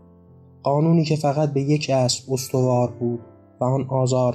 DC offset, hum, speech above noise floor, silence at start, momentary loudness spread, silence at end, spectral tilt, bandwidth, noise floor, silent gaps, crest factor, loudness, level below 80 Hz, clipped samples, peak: under 0.1%; none; 28 dB; 0.65 s; 8 LU; 0 s; -6 dB/octave; 14.5 kHz; -49 dBFS; none; 14 dB; -21 LUFS; -64 dBFS; under 0.1%; -8 dBFS